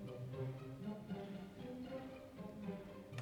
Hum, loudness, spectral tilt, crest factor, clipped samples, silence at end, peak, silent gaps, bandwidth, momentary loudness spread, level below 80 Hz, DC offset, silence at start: none; -49 LUFS; -7.5 dB/octave; 16 dB; under 0.1%; 0 s; -32 dBFS; none; over 20 kHz; 5 LU; -70 dBFS; under 0.1%; 0 s